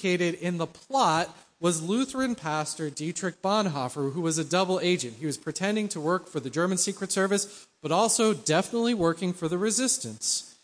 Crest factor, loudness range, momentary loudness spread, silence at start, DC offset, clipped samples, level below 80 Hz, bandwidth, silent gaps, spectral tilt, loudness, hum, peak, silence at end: 18 dB; 3 LU; 8 LU; 0 s; under 0.1%; under 0.1%; -66 dBFS; 10.5 kHz; none; -4 dB/octave; -27 LUFS; none; -10 dBFS; 0.15 s